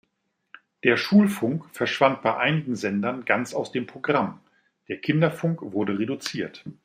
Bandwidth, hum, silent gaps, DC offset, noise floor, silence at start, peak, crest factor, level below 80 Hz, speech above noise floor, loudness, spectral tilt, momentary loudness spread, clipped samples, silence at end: 15.5 kHz; none; none; under 0.1%; -76 dBFS; 0.85 s; -2 dBFS; 22 dB; -68 dBFS; 52 dB; -24 LUFS; -6 dB/octave; 11 LU; under 0.1%; 0.1 s